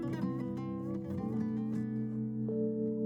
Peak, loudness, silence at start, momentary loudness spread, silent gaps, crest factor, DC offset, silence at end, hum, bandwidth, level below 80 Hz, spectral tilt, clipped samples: -22 dBFS; -36 LUFS; 0 s; 4 LU; none; 12 dB; under 0.1%; 0 s; none; 6.6 kHz; -64 dBFS; -10 dB/octave; under 0.1%